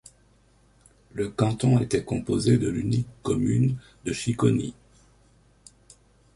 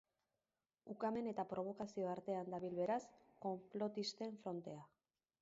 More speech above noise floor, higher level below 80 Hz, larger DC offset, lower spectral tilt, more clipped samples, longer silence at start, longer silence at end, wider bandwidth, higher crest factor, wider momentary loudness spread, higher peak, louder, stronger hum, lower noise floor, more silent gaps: second, 36 dB vs over 45 dB; first, -50 dBFS vs -84 dBFS; neither; first, -7 dB/octave vs -5 dB/octave; neither; first, 1.15 s vs 0.85 s; first, 1.65 s vs 0.55 s; first, 11.5 kHz vs 7.6 kHz; about the same, 20 dB vs 16 dB; about the same, 10 LU vs 12 LU; first, -6 dBFS vs -30 dBFS; first, -25 LUFS vs -45 LUFS; first, 50 Hz at -50 dBFS vs none; second, -60 dBFS vs under -90 dBFS; neither